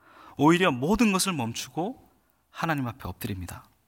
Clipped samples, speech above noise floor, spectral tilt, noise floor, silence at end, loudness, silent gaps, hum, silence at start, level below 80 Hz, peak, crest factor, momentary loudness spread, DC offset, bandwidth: under 0.1%; 37 dB; -4.5 dB/octave; -63 dBFS; 0.25 s; -26 LUFS; none; none; 0.25 s; -52 dBFS; -10 dBFS; 18 dB; 16 LU; under 0.1%; 17 kHz